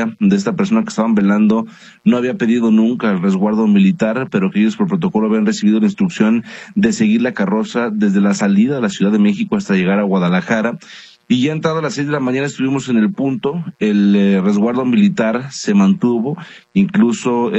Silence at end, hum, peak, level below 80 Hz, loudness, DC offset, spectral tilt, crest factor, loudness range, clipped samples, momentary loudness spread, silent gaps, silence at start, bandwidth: 0 s; none; 0 dBFS; -58 dBFS; -15 LUFS; under 0.1%; -6.5 dB/octave; 14 dB; 2 LU; under 0.1%; 6 LU; none; 0 s; 8.4 kHz